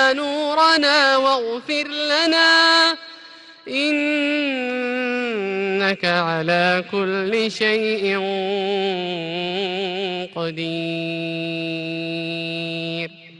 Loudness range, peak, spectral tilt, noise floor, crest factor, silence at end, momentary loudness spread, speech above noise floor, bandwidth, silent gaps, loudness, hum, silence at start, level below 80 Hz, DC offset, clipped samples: 9 LU; -4 dBFS; -4 dB/octave; -43 dBFS; 18 dB; 0 s; 11 LU; 23 dB; 11.5 kHz; none; -19 LUFS; none; 0 s; -68 dBFS; under 0.1%; under 0.1%